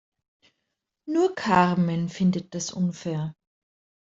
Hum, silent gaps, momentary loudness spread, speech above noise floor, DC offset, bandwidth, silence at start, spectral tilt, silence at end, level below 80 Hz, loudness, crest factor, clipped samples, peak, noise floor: none; none; 11 LU; 57 dB; under 0.1%; 7.8 kHz; 1.05 s; -6 dB/octave; 0.85 s; -64 dBFS; -25 LUFS; 22 dB; under 0.1%; -4 dBFS; -81 dBFS